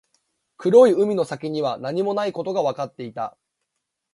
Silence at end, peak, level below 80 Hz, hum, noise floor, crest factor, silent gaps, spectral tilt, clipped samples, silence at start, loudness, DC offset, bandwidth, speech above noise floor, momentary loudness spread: 0.85 s; -2 dBFS; -70 dBFS; none; -80 dBFS; 20 dB; none; -6.5 dB/octave; under 0.1%; 0.6 s; -21 LUFS; under 0.1%; 11.5 kHz; 59 dB; 17 LU